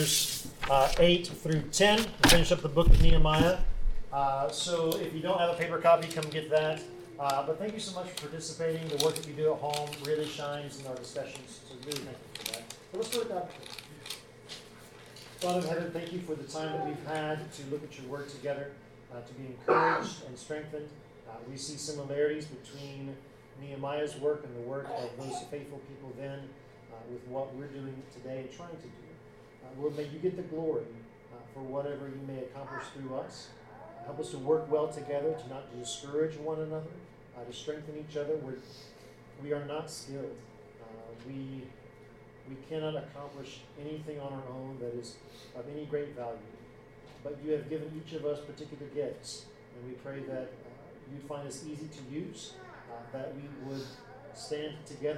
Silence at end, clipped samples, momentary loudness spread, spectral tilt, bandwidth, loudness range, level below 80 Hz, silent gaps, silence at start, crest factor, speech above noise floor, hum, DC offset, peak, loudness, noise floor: 0 s; under 0.1%; 22 LU; -4 dB/octave; 16 kHz; 14 LU; -38 dBFS; none; 0 s; 26 dB; 22 dB; none; under 0.1%; -8 dBFS; -33 LUFS; -54 dBFS